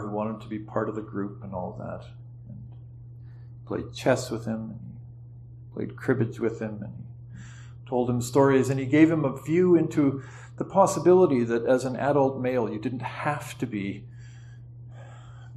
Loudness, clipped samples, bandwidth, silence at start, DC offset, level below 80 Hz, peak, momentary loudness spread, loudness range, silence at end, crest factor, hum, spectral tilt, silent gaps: -25 LUFS; under 0.1%; 13 kHz; 0 s; under 0.1%; -56 dBFS; -6 dBFS; 24 LU; 11 LU; 0 s; 20 dB; none; -7 dB/octave; none